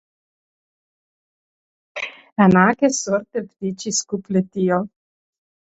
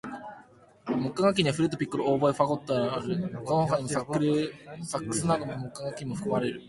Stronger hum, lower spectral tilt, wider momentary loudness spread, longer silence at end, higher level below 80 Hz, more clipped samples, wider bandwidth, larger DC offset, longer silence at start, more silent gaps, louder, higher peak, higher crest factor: neither; about the same, -5 dB/octave vs -5.5 dB/octave; first, 15 LU vs 11 LU; first, 0.8 s vs 0 s; about the same, -58 dBFS vs -60 dBFS; neither; second, 8.2 kHz vs 11.5 kHz; neither; first, 1.95 s vs 0.05 s; first, 2.32-2.36 s vs none; first, -20 LUFS vs -28 LUFS; first, -2 dBFS vs -8 dBFS; about the same, 20 dB vs 20 dB